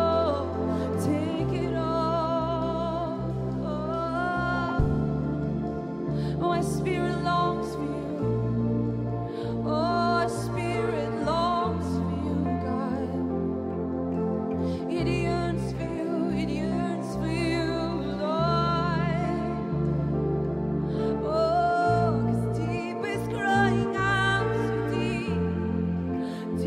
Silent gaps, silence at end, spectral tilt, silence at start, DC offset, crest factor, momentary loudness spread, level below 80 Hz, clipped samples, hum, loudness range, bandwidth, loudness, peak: none; 0 s; -7 dB/octave; 0 s; under 0.1%; 16 dB; 6 LU; -42 dBFS; under 0.1%; none; 3 LU; 13.5 kHz; -27 LUFS; -10 dBFS